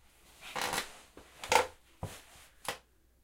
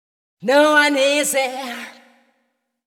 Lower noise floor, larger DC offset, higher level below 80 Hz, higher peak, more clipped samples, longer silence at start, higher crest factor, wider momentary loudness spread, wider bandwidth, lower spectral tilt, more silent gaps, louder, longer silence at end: second, -58 dBFS vs -71 dBFS; neither; first, -62 dBFS vs -78 dBFS; second, -8 dBFS vs -2 dBFS; neither; about the same, 0.4 s vs 0.4 s; first, 30 dB vs 18 dB; first, 23 LU vs 17 LU; about the same, 17 kHz vs 18 kHz; about the same, -1.5 dB/octave vs -1.5 dB/octave; neither; second, -35 LUFS vs -16 LUFS; second, 0.45 s vs 0.95 s